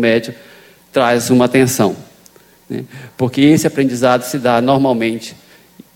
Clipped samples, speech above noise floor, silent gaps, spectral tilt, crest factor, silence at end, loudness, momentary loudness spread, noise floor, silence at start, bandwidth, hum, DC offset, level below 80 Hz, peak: under 0.1%; 33 dB; none; -5.5 dB/octave; 14 dB; 0.6 s; -14 LUFS; 16 LU; -46 dBFS; 0 s; 17 kHz; none; under 0.1%; -54 dBFS; 0 dBFS